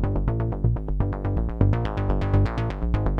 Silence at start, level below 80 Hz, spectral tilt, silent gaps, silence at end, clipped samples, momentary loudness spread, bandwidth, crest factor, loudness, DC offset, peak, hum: 0 s; -28 dBFS; -9.5 dB/octave; none; 0 s; under 0.1%; 4 LU; 5.6 kHz; 16 dB; -25 LUFS; under 0.1%; -6 dBFS; none